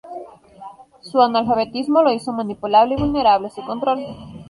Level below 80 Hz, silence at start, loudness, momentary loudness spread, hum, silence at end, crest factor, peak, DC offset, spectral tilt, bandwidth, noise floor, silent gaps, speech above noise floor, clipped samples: -46 dBFS; 0.05 s; -18 LUFS; 11 LU; none; 0.05 s; 16 dB; -2 dBFS; under 0.1%; -6.5 dB/octave; 11.5 kHz; -40 dBFS; none; 22 dB; under 0.1%